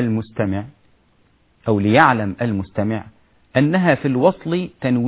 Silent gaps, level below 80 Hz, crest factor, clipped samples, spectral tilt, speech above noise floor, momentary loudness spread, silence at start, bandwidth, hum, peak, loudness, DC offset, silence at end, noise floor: none; -46 dBFS; 18 dB; under 0.1%; -11 dB/octave; 40 dB; 11 LU; 0 s; 4 kHz; none; 0 dBFS; -19 LUFS; under 0.1%; 0 s; -58 dBFS